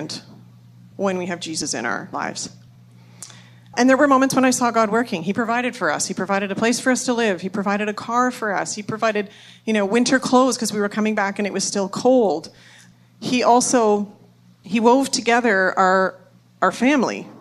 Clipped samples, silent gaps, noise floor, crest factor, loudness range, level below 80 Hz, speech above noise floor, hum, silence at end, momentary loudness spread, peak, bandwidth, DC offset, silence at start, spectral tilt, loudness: under 0.1%; none; -47 dBFS; 18 dB; 3 LU; -68 dBFS; 28 dB; none; 0.05 s; 12 LU; -2 dBFS; 13.5 kHz; under 0.1%; 0 s; -3.5 dB/octave; -19 LUFS